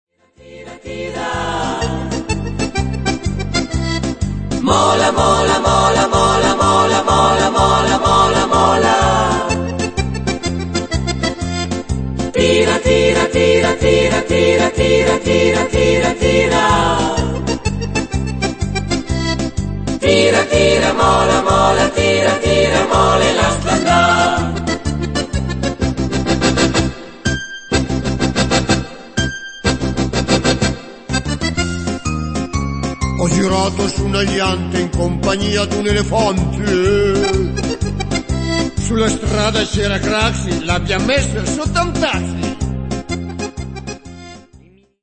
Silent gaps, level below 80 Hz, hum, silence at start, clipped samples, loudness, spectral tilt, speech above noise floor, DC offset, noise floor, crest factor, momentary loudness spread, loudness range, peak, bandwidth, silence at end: none; -28 dBFS; none; 0.45 s; under 0.1%; -15 LUFS; -4.5 dB/octave; 32 dB; under 0.1%; -46 dBFS; 16 dB; 9 LU; 6 LU; 0 dBFS; 8.8 kHz; 0.45 s